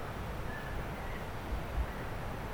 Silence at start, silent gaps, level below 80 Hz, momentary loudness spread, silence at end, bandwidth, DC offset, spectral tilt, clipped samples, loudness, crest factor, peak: 0 s; none; -42 dBFS; 2 LU; 0 s; over 20 kHz; under 0.1%; -6 dB/octave; under 0.1%; -40 LUFS; 14 dB; -24 dBFS